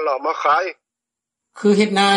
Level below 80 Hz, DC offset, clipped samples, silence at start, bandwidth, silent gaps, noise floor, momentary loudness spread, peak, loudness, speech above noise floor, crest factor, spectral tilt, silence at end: -68 dBFS; under 0.1%; under 0.1%; 0 s; 11 kHz; none; -85 dBFS; 6 LU; -2 dBFS; -18 LUFS; 68 dB; 16 dB; -4.5 dB/octave; 0 s